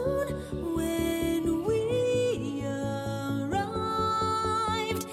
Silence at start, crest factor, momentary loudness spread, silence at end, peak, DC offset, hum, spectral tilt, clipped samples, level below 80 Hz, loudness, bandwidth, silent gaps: 0 s; 12 dB; 5 LU; 0 s; -16 dBFS; under 0.1%; none; -5.5 dB/octave; under 0.1%; -48 dBFS; -29 LUFS; 16 kHz; none